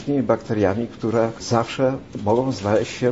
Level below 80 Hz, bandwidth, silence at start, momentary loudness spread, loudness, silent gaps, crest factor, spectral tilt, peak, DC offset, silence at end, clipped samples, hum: -52 dBFS; 8 kHz; 0 s; 3 LU; -22 LUFS; none; 18 dB; -6.5 dB/octave; -2 dBFS; 0.2%; 0 s; under 0.1%; none